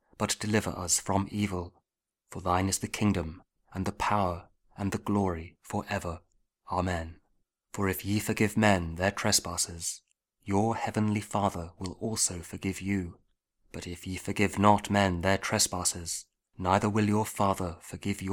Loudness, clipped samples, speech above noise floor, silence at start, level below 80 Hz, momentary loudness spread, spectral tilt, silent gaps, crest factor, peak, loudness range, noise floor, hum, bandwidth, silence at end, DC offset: -29 LUFS; under 0.1%; 53 dB; 0.2 s; -52 dBFS; 14 LU; -4 dB/octave; none; 24 dB; -6 dBFS; 6 LU; -82 dBFS; none; 19 kHz; 0 s; under 0.1%